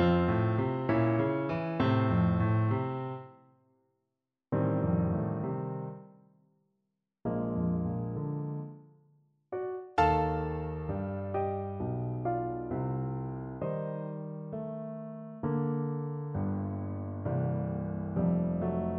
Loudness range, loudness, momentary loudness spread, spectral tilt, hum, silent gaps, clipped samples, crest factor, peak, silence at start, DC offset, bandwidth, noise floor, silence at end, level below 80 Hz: 6 LU; -32 LUFS; 12 LU; -10 dB/octave; none; none; under 0.1%; 20 dB; -12 dBFS; 0 s; under 0.1%; 5.8 kHz; -86 dBFS; 0 s; -52 dBFS